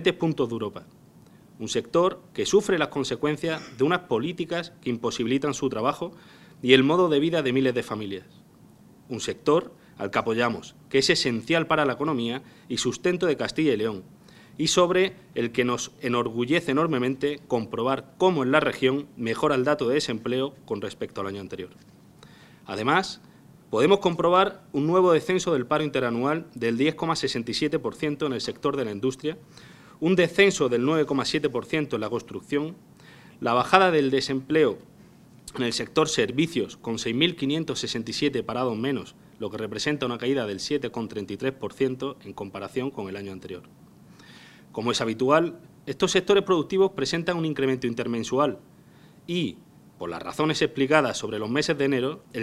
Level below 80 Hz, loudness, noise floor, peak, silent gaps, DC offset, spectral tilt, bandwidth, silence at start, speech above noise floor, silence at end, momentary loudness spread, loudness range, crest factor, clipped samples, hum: -60 dBFS; -25 LUFS; -53 dBFS; 0 dBFS; none; under 0.1%; -4.5 dB/octave; 13.5 kHz; 0 s; 28 dB; 0 s; 13 LU; 5 LU; 26 dB; under 0.1%; none